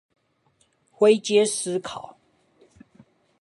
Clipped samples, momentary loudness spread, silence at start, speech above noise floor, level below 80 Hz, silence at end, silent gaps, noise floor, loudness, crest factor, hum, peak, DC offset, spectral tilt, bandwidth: under 0.1%; 19 LU; 1 s; 45 dB; -70 dBFS; 1.35 s; none; -66 dBFS; -21 LUFS; 20 dB; none; -6 dBFS; under 0.1%; -3.5 dB/octave; 11.5 kHz